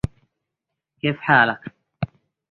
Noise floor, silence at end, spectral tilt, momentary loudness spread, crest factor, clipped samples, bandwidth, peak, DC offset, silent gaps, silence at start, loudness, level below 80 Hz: -83 dBFS; 0.45 s; -7 dB/octave; 17 LU; 22 dB; under 0.1%; 10 kHz; -2 dBFS; under 0.1%; none; 1.05 s; -21 LUFS; -46 dBFS